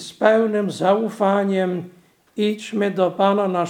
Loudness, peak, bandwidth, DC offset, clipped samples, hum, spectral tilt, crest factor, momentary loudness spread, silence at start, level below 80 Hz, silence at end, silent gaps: -20 LUFS; -2 dBFS; 15 kHz; under 0.1%; under 0.1%; none; -6 dB/octave; 18 dB; 7 LU; 0 s; -74 dBFS; 0 s; none